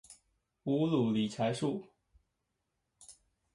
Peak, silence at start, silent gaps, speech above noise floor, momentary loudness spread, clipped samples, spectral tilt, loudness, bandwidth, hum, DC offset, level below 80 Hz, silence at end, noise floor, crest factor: -20 dBFS; 0.1 s; none; 52 dB; 11 LU; under 0.1%; -6.5 dB/octave; -33 LUFS; 11.5 kHz; none; under 0.1%; -72 dBFS; 0.4 s; -84 dBFS; 18 dB